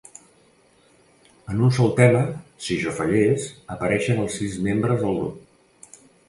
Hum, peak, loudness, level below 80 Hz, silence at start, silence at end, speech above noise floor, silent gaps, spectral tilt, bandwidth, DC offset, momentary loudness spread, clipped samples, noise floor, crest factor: none; -2 dBFS; -22 LUFS; -52 dBFS; 1.45 s; 0.9 s; 36 dB; none; -6.5 dB/octave; 11.5 kHz; under 0.1%; 13 LU; under 0.1%; -57 dBFS; 20 dB